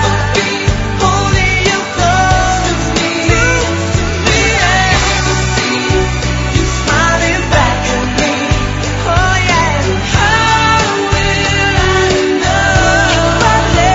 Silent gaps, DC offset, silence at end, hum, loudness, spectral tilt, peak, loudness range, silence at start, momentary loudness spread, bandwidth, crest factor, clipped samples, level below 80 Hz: none; under 0.1%; 0 s; none; -11 LUFS; -4 dB/octave; 0 dBFS; 2 LU; 0 s; 4 LU; 8 kHz; 12 dB; under 0.1%; -20 dBFS